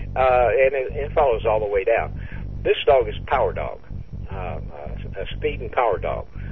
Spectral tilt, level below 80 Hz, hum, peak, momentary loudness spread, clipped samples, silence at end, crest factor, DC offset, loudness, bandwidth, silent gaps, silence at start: -8.5 dB/octave; -34 dBFS; none; -6 dBFS; 16 LU; under 0.1%; 0 s; 16 dB; 1%; -22 LUFS; 5.8 kHz; none; 0 s